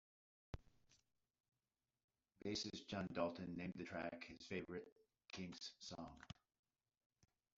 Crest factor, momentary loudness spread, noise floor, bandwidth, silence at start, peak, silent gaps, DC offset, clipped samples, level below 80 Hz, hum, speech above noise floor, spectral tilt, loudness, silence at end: 24 dB; 14 LU; under -90 dBFS; 7.6 kHz; 0.55 s; -28 dBFS; 2.04-2.08 s, 4.92-4.96 s; under 0.1%; under 0.1%; -74 dBFS; none; over 40 dB; -4 dB/octave; -50 LUFS; 1.3 s